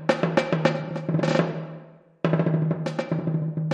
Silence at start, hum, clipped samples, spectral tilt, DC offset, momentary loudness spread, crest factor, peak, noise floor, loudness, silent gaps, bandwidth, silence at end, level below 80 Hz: 0 s; none; under 0.1%; -7.5 dB/octave; under 0.1%; 7 LU; 22 dB; -4 dBFS; -46 dBFS; -25 LUFS; none; 8.2 kHz; 0 s; -64 dBFS